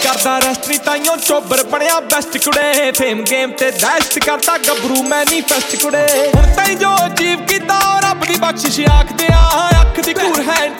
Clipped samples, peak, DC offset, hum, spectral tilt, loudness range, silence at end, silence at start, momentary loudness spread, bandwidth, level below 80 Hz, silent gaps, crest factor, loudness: under 0.1%; 0 dBFS; under 0.1%; none; -3 dB/octave; 1 LU; 0 s; 0 s; 3 LU; 17.5 kHz; -20 dBFS; none; 12 dB; -12 LUFS